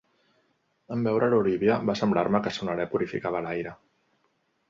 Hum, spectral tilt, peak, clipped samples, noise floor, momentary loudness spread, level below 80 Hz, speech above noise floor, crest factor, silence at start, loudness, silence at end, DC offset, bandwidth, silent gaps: none; -7 dB/octave; -8 dBFS; under 0.1%; -72 dBFS; 10 LU; -60 dBFS; 46 dB; 18 dB; 0.9 s; -26 LUFS; 0.95 s; under 0.1%; 7.4 kHz; none